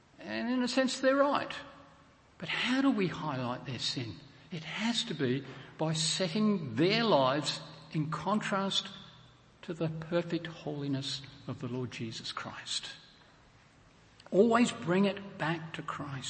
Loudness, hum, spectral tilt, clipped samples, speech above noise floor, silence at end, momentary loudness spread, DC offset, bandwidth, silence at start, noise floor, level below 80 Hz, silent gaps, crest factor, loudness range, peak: -32 LUFS; none; -4.5 dB/octave; under 0.1%; 29 dB; 0 s; 16 LU; under 0.1%; 8.8 kHz; 0.2 s; -61 dBFS; -70 dBFS; none; 20 dB; 7 LU; -12 dBFS